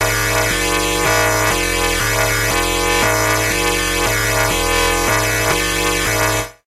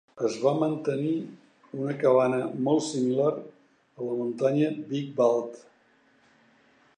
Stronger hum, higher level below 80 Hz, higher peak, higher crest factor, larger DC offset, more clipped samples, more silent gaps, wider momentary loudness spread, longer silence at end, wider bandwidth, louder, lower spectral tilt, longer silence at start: neither; first, -28 dBFS vs -80 dBFS; first, 0 dBFS vs -10 dBFS; about the same, 16 dB vs 18 dB; neither; neither; neither; second, 2 LU vs 11 LU; second, 0.15 s vs 1.4 s; first, 16 kHz vs 9.8 kHz; first, -15 LUFS vs -27 LUFS; second, -2.5 dB/octave vs -6.5 dB/octave; second, 0 s vs 0.15 s